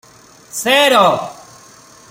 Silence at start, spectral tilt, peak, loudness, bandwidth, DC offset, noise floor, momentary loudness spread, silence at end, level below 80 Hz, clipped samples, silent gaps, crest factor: 0.55 s; -2 dB/octave; 0 dBFS; -12 LUFS; 16.5 kHz; under 0.1%; -44 dBFS; 18 LU; 0.75 s; -62 dBFS; under 0.1%; none; 16 dB